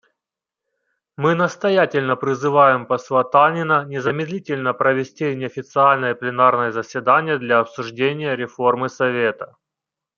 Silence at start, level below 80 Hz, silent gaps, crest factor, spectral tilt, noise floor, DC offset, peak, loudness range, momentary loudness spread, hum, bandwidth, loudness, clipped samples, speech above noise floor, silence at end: 1.2 s; -70 dBFS; none; 18 dB; -6 dB/octave; -86 dBFS; under 0.1%; -2 dBFS; 2 LU; 9 LU; none; 7.4 kHz; -19 LUFS; under 0.1%; 67 dB; 0.7 s